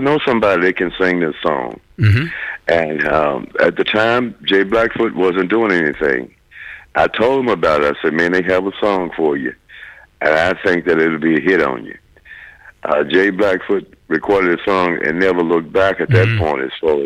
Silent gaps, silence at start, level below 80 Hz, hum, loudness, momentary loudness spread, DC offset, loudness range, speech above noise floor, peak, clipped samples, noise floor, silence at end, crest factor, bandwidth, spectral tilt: none; 0 s; -44 dBFS; none; -15 LUFS; 8 LU; under 0.1%; 2 LU; 24 dB; -2 dBFS; under 0.1%; -40 dBFS; 0 s; 14 dB; 10.5 kHz; -7 dB/octave